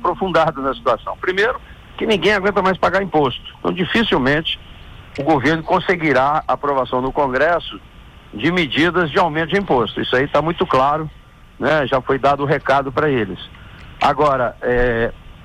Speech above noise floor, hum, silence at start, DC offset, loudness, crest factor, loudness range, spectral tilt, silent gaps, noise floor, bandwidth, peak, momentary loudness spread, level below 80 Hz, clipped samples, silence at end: 21 dB; none; 0 s; under 0.1%; -17 LUFS; 12 dB; 1 LU; -6 dB/octave; none; -38 dBFS; 13.5 kHz; -6 dBFS; 8 LU; -38 dBFS; under 0.1%; 0 s